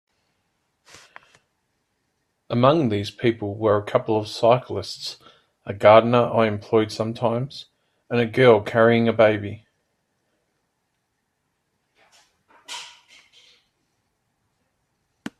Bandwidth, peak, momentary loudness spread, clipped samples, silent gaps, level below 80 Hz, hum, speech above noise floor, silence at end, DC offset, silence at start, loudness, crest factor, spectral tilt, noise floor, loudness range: 13 kHz; 0 dBFS; 20 LU; under 0.1%; none; -64 dBFS; none; 55 dB; 2.5 s; under 0.1%; 2.5 s; -20 LUFS; 22 dB; -6.5 dB/octave; -74 dBFS; 6 LU